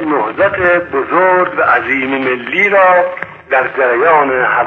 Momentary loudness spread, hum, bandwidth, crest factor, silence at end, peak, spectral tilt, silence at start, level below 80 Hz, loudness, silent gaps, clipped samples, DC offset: 7 LU; none; 6.6 kHz; 12 dB; 0 s; 0 dBFS; -7 dB/octave; 0 s; -50 dBFS; -11 LUFS; none; under 0.1%; under 0.1%